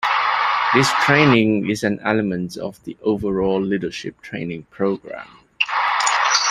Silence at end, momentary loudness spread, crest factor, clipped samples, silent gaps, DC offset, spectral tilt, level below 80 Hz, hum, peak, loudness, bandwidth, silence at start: 0 s; 16 LU; 18 dB; under 0.1%; none; under 0.1%; -4 dB/octave; -52 dBFS; none; -2 dBFS; -19 LUFS; 14 kHz; 0 s